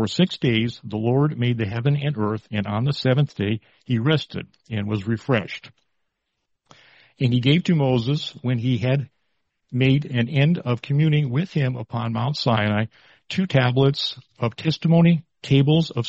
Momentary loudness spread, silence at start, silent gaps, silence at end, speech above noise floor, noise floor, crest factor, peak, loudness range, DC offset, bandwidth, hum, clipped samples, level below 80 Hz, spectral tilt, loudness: 9 LU; 0 s; none; 0 s; 55 dB; -76 dBFS; 18 dB; -4 dBFS; 4 LU; under 0.1%; 7.8 kHz; none; under 0.1%; -56 dBFS; -7.5 dB/octave; -22 LUFS